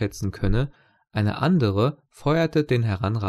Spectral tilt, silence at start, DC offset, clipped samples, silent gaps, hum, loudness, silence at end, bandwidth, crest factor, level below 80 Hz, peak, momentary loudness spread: -7.5 dB/octave; 0 s; under 0.1%; under 0.1%; none; none; -24 LUFS; 0 s; 13 kHz; 14 dB; -36 dBFS; -8 dBFS; 8 LU